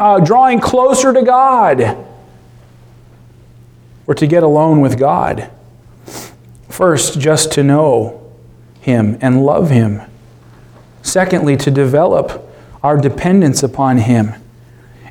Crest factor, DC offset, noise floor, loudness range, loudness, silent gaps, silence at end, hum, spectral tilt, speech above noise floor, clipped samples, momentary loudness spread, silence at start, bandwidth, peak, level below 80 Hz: 12 dB; under 0.1%; -41 dBFS; 3 LU; -12 LUFS; none; 0 s; none; -6 dB/octave; 30 dB; under 0.1%; 15 LU; 0 s; 18 kHz; 0 dBFS; -44 dBFS